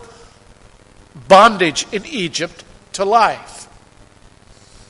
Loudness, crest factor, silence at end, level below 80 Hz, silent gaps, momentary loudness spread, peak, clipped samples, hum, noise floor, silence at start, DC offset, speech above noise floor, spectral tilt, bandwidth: -14 LUFS; 18 dB; 1.25 s; -50 dBFS; none; 21 LU; 0 dBFS; under 0.1%; none; -46 dBFS; 1.15 s; under 0.1%; 31 dB; -3.5 dB/octave; 11.5 kHz